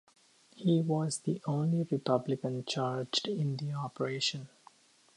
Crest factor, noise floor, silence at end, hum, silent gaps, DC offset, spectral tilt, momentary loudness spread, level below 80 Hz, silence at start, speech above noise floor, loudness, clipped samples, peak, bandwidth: 20 dB; -62 dBFS; 0.7 s; none; none; under 0.1%; -5.5 dB/octave; 6 LU; -78 dBFS; 0.55 s; 30 dB; -33 LUFS; under 0.1%; -14 dBFS; 11.5 kHz